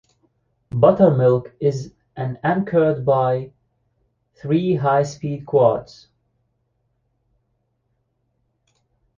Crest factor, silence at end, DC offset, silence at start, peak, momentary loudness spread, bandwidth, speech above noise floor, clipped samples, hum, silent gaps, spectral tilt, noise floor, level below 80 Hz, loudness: 20 dB; 3.35 s; under 0.1%; 0.75 s; -2 dBFS; 15 LU; 7.4 kHz; 52 dB; under 0.1%; none; none; -8 dB/octave; -70 dBFS; -56 dBFS; -19 LUFS